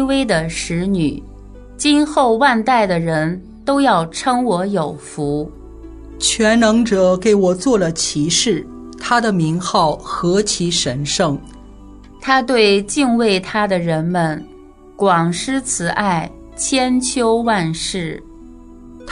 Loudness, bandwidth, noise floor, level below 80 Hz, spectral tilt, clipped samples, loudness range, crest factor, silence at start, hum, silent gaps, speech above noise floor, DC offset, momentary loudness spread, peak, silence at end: -16 LUFS; 11 kHz; -40 dBFS; -40 dBFS; -4 dB/octave; under 0.1%; 3 LU; 16 dB; 0 s; none; none; 24 dB; under 0.1%; 10 LU; 0 dBFS; 0 s